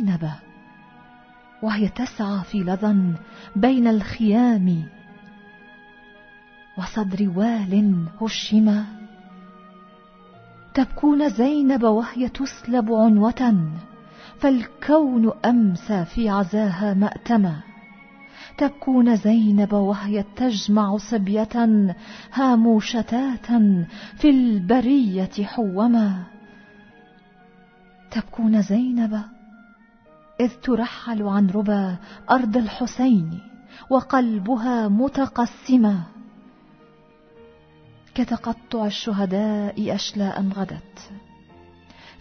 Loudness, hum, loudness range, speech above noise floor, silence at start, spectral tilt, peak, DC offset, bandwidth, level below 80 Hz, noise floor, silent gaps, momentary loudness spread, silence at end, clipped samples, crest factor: -21 LUFS; none; 6 LU; 32 dB; 0 s; -7 dB/octave; -4 dBFS; under 0.1%; 6.6 kHz; -50 dBFS; -52 dBFS; none; 12 LU; 0.1 s; under 0.1%; 18 dB